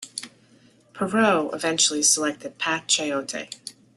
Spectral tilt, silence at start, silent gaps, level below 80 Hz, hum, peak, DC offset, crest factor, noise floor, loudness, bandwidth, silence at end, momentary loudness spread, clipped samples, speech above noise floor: -1.5 dB/octave; 0 s; none; -68 dBFS; none; -6 dBFS; under 0.1%; 20 dB; -56 dBFS; -22 LUFS; 12.5 kHz; 0.25 s; 17 LU; under 0.1%; 33 dB